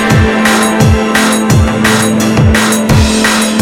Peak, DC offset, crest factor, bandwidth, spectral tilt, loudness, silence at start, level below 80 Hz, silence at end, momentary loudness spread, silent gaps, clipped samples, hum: 0 dBFS; under 0.1%; 8 dB; 17 kHz; -4.5 dB/octave; -9 LUFS; 0 s; -20 dBFS; 0 s; 1 LU; none; 0.2%; none